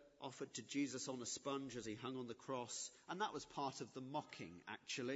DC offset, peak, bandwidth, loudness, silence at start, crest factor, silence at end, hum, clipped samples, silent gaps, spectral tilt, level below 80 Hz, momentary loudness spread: under 0.1%; -30 dBFS; 8 kHz; -48 LUFS; 0 s; 16 dB; 0 s; none; under 0.1%; none; -3.5 dB/octave; -82 dBFS; 8 LU